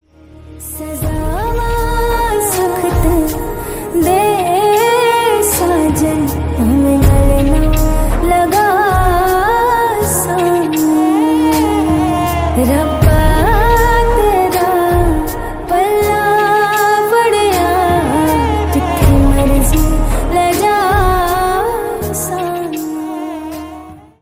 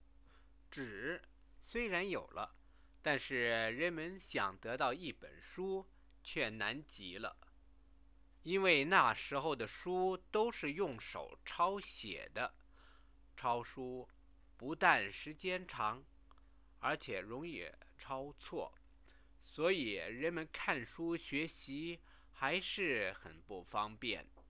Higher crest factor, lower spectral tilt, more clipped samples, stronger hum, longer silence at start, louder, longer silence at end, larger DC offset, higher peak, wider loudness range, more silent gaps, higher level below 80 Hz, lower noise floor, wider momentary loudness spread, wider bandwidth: second, 12 dB vs 26 dB; first, -5.5 dB/octave vs -2 dB/octave; neither; neither; second, 0.4 s vs 0.7 s; first, -13 LUFS vs -39 LUFS; about the same, 0.2 s vs 0.1 s; neither; first, 0 dBFS vs -14 dBFS; second, 3 LU vs 8 LU; neither; first, -20 dBFS vs -66 dBFS; second, -37 dBFS vs -66 dBFS; second, 9 LU vs 13 LU; first, 16.5 kHz vs 4 kHz